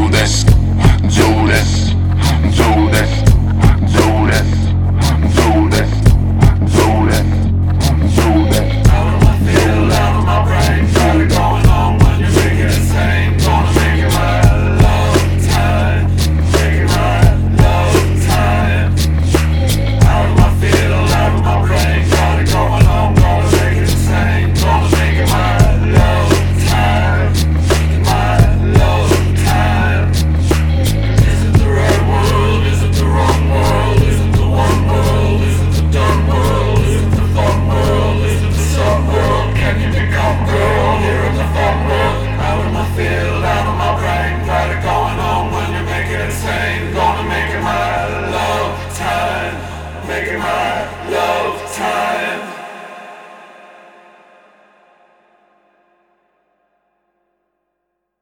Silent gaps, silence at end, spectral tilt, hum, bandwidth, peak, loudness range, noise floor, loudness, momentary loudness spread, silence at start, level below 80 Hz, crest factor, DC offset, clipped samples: none; 4.85 s; -6 dB/octave; none; 18 kHz; 0 dBFS; 6 LU; -72 dBFS; -13 LUFS; 6 LU; 0 s; -18 dBFS; 12 dB; under 0.1%; under 0.1%